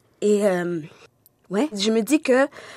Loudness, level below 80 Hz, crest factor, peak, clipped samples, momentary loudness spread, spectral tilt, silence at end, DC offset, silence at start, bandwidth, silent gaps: -22 LUFS; -74 dBFS; 16 dB; -6 dBFS; under 0.1%; 9 LU; -4.5 dB/octave; 0 s; under 0.1%; 0.2 s; 14.5 kHz; none